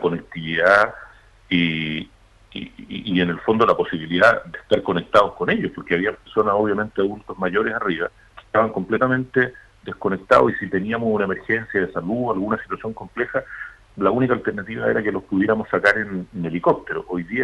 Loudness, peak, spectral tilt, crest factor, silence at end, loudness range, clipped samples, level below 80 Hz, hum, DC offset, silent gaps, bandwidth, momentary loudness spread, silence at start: -21 LUFS; -2 dBFS; -7 dB/octave; 18 dB; 0 s; 4 LU; under 0.1%; -52 dBFS; none; under 0.1%; none; 11.5 kHz; 13 LU; 0 s